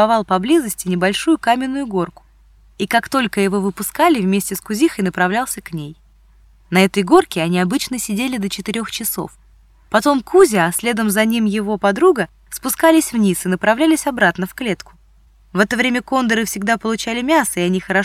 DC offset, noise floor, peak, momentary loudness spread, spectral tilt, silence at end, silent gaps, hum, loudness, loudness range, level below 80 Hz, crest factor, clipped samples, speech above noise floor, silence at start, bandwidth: under 0.1%; -50 dBFS; 0 dBFS; 9 LU; -4.5 dB/octave; 0 s; none; none; -17 LUFS; 3 LU; -48 dBFS; 16 dB; under 0.1%; 33 dB; 0 s; 16.5 kHz